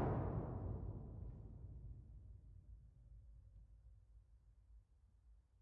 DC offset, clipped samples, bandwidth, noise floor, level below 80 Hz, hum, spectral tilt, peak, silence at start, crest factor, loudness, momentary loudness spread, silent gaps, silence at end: under 0.1%; under 0.1%; 3.5 kHz; -70 dBFS; -58 dBFS; none; -10.5 dB/octave; -30 dBFS; 0 s; 20 dB; -50 LUFS; 22 LU; none; 0.2 s